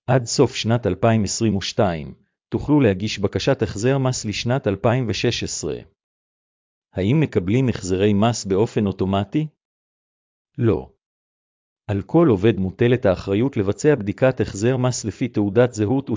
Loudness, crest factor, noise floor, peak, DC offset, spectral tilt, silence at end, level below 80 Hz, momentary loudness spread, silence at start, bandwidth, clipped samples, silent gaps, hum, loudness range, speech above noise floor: -20 LUFS; 18 dB; under -90 dBFS; -2 dBFS; under 0.1%; -6 dB/octave; 0 s; -44 dBFS; 8 LU; 0.1 s; 7.6 kHz; under 0.1%; 6.04-6.82 s, 9.65-10.45 s, 11.06-11.76 s; none; 4 LU; over 71 dB